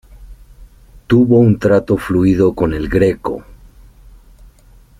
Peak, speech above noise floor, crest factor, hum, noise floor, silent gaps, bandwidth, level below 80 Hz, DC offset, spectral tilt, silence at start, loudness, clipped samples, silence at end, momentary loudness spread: -2 dBFS; 32 dB; 14 dB; none; -45 dBFS; none; 14.5 kHz; -36 dBFS; under 0.1%; -9 dB/octave; 0.15 s; -14 LUFS; under 0.1%; 1.45 s; 10 LU